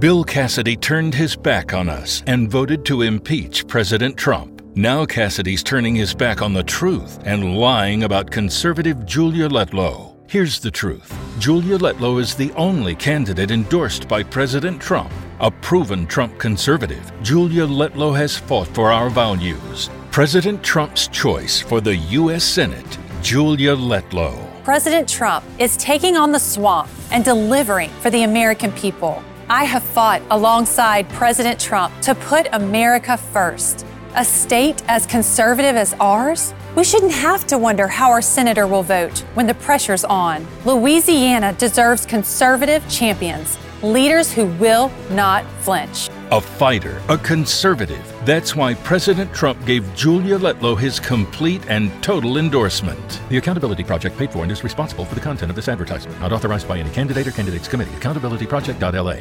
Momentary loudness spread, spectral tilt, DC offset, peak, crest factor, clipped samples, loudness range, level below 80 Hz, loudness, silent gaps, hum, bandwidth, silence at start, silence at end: 9 LU; -4 dB/octave; under 0.1%; -4 dBFS; 14 dB; under 0.1%; 5 LU; -40 dBFS; -17 LUFS; none; none; 19 kHz; 0 s; 0 s